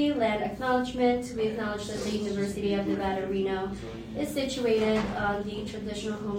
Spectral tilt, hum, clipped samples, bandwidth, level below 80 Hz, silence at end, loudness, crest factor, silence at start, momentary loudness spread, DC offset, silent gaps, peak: -5.5 dB/octave; none; under 0.1%; 16 kHz; -50 dBFS; 0 s; -29 LUFS; 14 dB; 0 s; 8 LU; under 0.1%; none; -14 dBFS